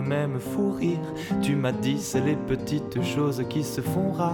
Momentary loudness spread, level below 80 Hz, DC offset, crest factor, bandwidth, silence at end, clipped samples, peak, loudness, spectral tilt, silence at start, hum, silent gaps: 3 LU; -52 dBFS; under 0.1%; 12 dB; 19 kHz; 0 s; under 0.1%; -14 dBFS; -27 LUFS; -6.5 dB/octave; 0 s; none; none